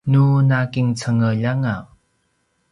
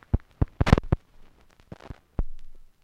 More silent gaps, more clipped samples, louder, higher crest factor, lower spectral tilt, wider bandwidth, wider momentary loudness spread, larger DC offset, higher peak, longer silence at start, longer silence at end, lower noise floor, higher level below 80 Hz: neither; neither; first, -18 LUFS vs -27 LUFS; second, 12 dB vs 24 dB; about the same, -7.5 dB/octave vs -7.5 dB/octave; about the same, 10.5 kHz vs 11 kHz; second, 8 LU vs 23 LU; neither; about the same, -6 dBFS vs -4 dBFS; about the same, 0.05 s vs 0.15 s; first, 0.9 s vs 0.2 s; first, -67 dBFS vs -53 dBFS; second, -52 dBFS vs -32 dBFS